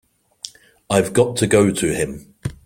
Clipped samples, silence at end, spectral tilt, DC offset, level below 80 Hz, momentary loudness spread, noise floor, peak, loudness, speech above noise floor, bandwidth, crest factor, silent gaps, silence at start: under 0.1%; 0.1 s; -5 dB/octave; under 0.1%; -46 dBFS; 20 LU; -39 dBFS; -2 dBFS; -18 LUFS; 22 dB; 16.5 kHz; 18 dB; none; 0.45 s